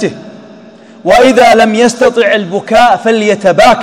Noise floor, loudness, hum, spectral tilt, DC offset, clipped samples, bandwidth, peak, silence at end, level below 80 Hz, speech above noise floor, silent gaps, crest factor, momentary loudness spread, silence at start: -34 dBFS; -7 LUFS; none; -4 dB/octave; under 0.1%; 5%; 16.5 kHz; 0 dBFS; 0 s; -40 dBFS; 28 dB; none; 8 dB; 6 LU; 0 s